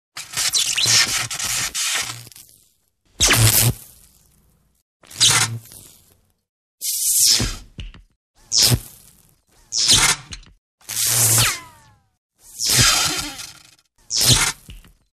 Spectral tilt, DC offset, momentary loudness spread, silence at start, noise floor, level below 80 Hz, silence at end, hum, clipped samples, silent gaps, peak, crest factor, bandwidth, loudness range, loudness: -1 dB/octave; under 0.1%; 17 LU; 0.15 s; -62 dBFS; -40 dBFS; 0.35 s; none; under 0.1%; 4.82-5.00 s, 6.49-6.78 s, 8.16-8.34 s, 10.58-10.78 s, 12.18-12.30 s; -2 dBFS; 20 dB; 14 kHz; 3 LU; -16 LUFS